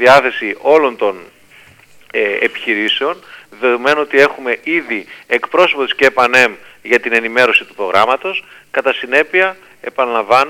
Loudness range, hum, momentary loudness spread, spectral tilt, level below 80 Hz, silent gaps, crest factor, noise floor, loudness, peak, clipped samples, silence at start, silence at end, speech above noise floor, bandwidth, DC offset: 4 LU; none; 11 LU; -3.5 dB/octave; -58 dBFS; none; 14 dB; -44 dBFS; -13 LUFS; 0 dBFS; 0.1%; 0 s; 0 s; 31 dB; 16.5 kHz; under 0.1%